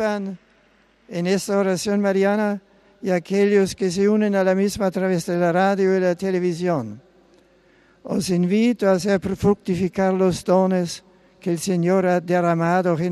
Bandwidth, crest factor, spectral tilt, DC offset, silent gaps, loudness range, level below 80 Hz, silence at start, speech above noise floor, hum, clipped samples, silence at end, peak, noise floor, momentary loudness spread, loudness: 13 kHz; 14 dB; -6 dB/octave; under 0.1%; none; 3 LU; -54 dBFS; 0 s; 38 dB; none; under 0.1%; 0 s; -6 dBFS; -58 dBFS; 8 LU; -20 LUFS